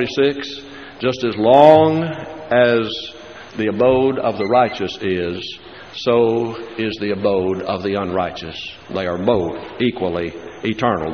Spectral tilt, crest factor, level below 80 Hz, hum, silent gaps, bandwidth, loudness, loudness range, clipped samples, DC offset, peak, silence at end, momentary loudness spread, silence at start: -4 dB/octave; 18 dB; -50 dBFS; none; none; 6.6 kHz; -18 LUFS; 6 LU; under 0.1%; 0.2%; 0 dBFS; 0 s; 15 LU; 0 s